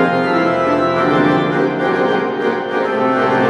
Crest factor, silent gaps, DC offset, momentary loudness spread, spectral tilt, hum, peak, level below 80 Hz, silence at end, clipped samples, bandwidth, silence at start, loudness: 14 dB; none; under 0.1%; 4 LU; -7 dB/octave; none; 0 dBFS; -56 dBFS; 0 s; under 0.1%; 10.5 kHz; 0 s; -15 LUFS